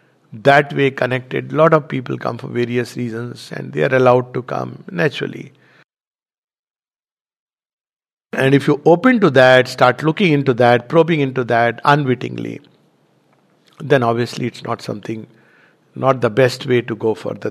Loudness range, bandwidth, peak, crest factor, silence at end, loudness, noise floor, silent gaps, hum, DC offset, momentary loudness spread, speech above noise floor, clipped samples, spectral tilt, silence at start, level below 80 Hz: 10 LU; 13.5 kHz; 0 dBFS; 18 dB; 0 s; -16 LUFS; under -90 dBFS; 6.07-6.11 s, 6.38-6.48 s, 6.59-6.63 s, 6.71-6.75 s, 7.21-7.25 s, 7.39-7.47 s, 7.73-7.78 s, 8.13-8.17 s; none; under 0.1%; 14 LU; over 74 dB; under 0.1%; -6.5 dB/octave; 0.3 s; -64 dBFS